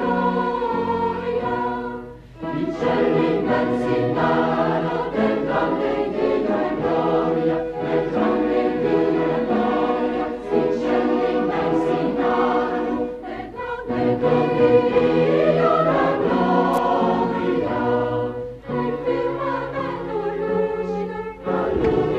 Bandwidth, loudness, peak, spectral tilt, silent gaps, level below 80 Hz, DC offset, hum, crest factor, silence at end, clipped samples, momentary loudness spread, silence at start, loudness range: 8 kHz; -21 LUFS; -4 dBFS; -8 dB/octave; none; -46 dBFS; under 0.1%; none; 16 dB; 0 s; under 0.1%; 8 LU; 0 s; 5 LU